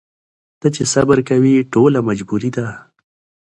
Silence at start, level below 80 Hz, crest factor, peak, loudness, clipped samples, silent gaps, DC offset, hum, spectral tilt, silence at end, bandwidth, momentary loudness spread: 0.65 s; -50 dBFS; 16 dB; 0 dBFS; -15 LUFS; under 0.1%; none; under 0.1%; none; -6 dB/octave; 0.65 s; 11.5 kHz; 9 LU